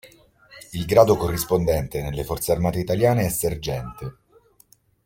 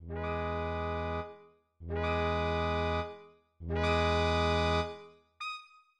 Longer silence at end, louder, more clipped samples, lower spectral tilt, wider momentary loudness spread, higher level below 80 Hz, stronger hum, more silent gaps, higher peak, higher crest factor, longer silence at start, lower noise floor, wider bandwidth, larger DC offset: first, 0.95 s vs 0.35 s; first, -22 LUFS vs -33 LUFS; neither; about the same, -5.5 dB/octave vs -6 dB/octave; about the same, 16 LU vs 16 LU; about the same, -42 dBFS vs -44 dBFS; neither; neither; first, -2 dBFS vs -16 dBFS; first, 22 dB vs 16 dB; about the same, 0.05 s vs 0 s; about the same, -58 dBFS vs -57 dBFS; first, 17 kHz vs 9.2 kHz; neither